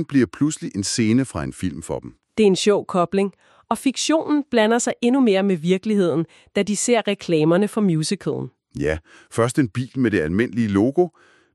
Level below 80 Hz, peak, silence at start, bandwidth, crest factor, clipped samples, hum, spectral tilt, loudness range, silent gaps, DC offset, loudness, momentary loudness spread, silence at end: -50 dBFS; -4 dBFS; 0 s; 12.5 kHz; 16 dB; under 0.1%; none; -5 dB/octave; 3 LU; none; under 0.1%; -21 LUFS; 10 LU; 0.45 s